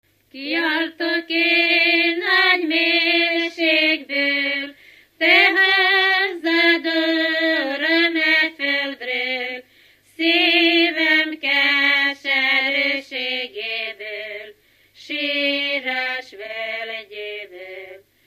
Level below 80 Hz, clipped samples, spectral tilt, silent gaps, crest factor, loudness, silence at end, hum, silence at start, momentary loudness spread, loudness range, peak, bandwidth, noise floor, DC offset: -74 dBFS; under 0.1%; -2 dB/octave; none; 18 dB; -17 LUFS; 0.3 s; 50 Hz at -70 dBFS; 0.35 s; 16 LU; 8 LU; -2 dBFS; 15 kHz; -54 dBFS; under 0.1%